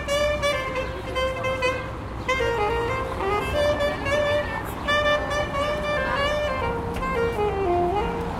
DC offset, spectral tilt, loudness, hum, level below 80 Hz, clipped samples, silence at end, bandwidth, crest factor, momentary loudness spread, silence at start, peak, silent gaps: under 0.1%; -5 dB/octave; -24 LUFS; none; -36 dBFS; under 0.1%; 0 s; 16 kHz; 14 dB; 5 LU; 0 s; -10 dBFS; none